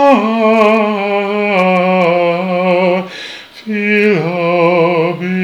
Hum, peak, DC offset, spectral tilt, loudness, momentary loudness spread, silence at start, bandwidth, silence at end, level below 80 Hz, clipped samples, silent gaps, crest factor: none; 0 dBFS; under 0.1%; -7 dB/octave; -12 LUFS; 8 LU; 0 s; 10.5 kHz; 0 s; -62 dBFS; under 0.1%; none; 12 dB